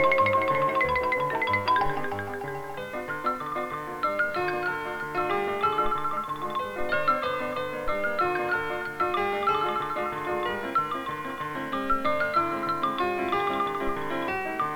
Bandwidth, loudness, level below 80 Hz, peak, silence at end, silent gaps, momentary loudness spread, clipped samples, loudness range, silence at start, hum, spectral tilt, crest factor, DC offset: 19 kHz; -27 LUFS; -50 dBFS; -12 dBFS; 0 s; none; 8 LU; under 0.1%; 2 LU; 0 s; none; -5.5 dB/octave; 16 dB; under 0.1%